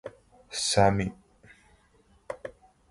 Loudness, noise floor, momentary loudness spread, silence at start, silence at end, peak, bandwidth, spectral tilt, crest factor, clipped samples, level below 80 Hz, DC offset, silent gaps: -26 LUFS; -63 dBFS; 22 LU; 0.05 s; 0.4 s; -8 dBFS; 11.5 kHz; -4 dB/octave; 24 dB; under 0.1%; -52 dBFS; under 0.1%; none